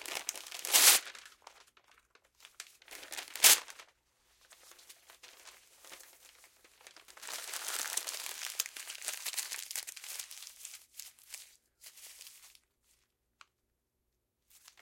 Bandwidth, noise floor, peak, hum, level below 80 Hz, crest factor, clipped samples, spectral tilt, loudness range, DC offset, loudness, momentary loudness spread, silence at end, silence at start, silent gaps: 17 kHz; -83 dBFS; -4 dBFS; none; -82 dBFS; 32 dB; under 0.1%; 3.5 dB/octave; 21 LU; under 0.1%; -30 LUFS; 29 LU; 2.35 s; 0 s; none